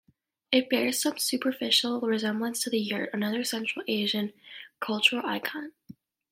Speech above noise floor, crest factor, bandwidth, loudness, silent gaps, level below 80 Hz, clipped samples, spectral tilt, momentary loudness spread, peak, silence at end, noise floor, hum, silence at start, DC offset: 24 dB; 24 dB; 16.5 kHz; -27 LUFS; none; -78 dBFS; under 0.1%; -2.5 dB/octave; 12 LU; -6 dBFS; 0.4 s; -52 dBFS; none; 0.5 s; under 0.1%